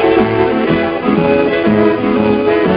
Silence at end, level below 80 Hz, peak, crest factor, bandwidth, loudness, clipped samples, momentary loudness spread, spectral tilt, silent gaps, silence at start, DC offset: 0 s; -40 dBFS; 0 dBFS; 12 dB; 5.2 kHz; -12 LUFS; under 0.1%; 2 LU; -11 dB/octave; none; 0 s; under 0.1%